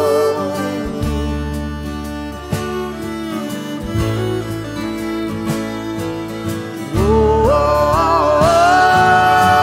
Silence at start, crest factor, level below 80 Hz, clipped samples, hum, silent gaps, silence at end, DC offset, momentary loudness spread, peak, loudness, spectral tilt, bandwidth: 0 s; 14 dB; -30 dBFS; under 0.1%; none; none; 0 s; under 0.1%; 13 LU; -2 dBFS; -17 LUFS; -5.5 dB/octave; 16 kHz